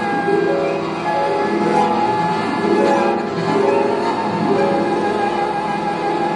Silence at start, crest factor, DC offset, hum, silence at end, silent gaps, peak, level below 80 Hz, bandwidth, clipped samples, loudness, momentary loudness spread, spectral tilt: 0 s; 14 dB; under 0.1%; none; 0 s; none; -4 dBFS; -54 dBFS; 11 kHz; under 0.1%; -18 LUFS; 4 LU; -6 dB/octave